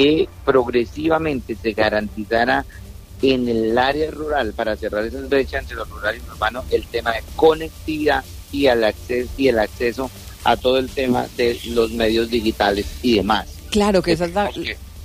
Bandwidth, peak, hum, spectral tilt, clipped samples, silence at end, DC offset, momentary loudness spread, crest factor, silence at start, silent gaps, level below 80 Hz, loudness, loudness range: 15.5 kHz; -4 dBFS; none; -5 dB/octave; under 0.1%; 0 s; under 0.1%; 8 LU; 16 dB; 0 s; none; -36 dBFS; -20 LUFS; 2 LU